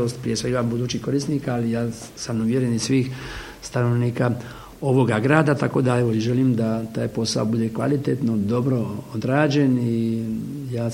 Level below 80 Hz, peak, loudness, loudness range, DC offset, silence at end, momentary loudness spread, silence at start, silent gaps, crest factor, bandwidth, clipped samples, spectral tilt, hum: -50 dBFS; 0 dBFS; -22 LUFS; 3 LU; under 0.1%; 0 s; 10 LU; 0 s; none; 20 dB; 16 kHz; under 0.1%; -6.5 dB/octave; none